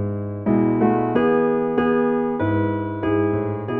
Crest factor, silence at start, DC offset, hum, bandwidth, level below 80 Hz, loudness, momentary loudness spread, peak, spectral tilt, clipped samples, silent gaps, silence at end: 16 dB; 0 s; under 0.1%; none; 3.7 kHz; -48 dBFS; -20 LUFS; 6 LU; -4 dBFS; -11.5 dB/octave; under 0.1%; none; 0 s